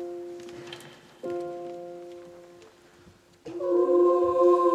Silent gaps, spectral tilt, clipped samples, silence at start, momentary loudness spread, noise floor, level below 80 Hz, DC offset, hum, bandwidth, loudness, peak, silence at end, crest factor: none; -6.5 dB/octave; under 0.1%; 0 s; 23 LU; -56 dBFS; -70 dBFS; under 0.1%; none; 8.2 kHz; -24 LUFS; -10 dBFS; 0 s; 16 dB